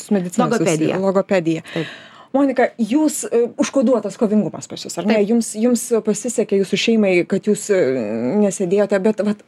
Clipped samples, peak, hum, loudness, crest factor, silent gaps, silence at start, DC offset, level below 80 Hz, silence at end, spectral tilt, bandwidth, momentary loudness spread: under 0.1%; -2 dBFS; none; -18 LUFS; 16 dB; none; 0 s; under 0.1%; -66 dBFS; 0.1 s; -5 dB/octave; 13.5 kHz; 7 LU